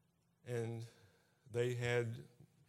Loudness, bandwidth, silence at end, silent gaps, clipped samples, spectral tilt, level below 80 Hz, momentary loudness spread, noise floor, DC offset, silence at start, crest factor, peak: -41 LUFS; 14 kHz; 0.25 s; none; under 0.1%; -6 dB/octave; -78 dBFS; 19 LU; -70 dBFS; under 0.1%; 0.45 s; 20 dB; -22 dBFS